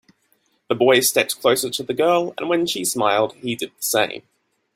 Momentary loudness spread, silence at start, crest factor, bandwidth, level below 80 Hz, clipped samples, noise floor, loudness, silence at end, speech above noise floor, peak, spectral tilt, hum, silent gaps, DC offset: 10 LU; 0.7 s; 18 dB; 16.5 kHz; -64 dBFS; under 0.1%; -65 dBFS; -19 LUFS; 0.55 s; 45 dB; -2 dBFS; -2.5 dB/octave; none; none; under 0.1%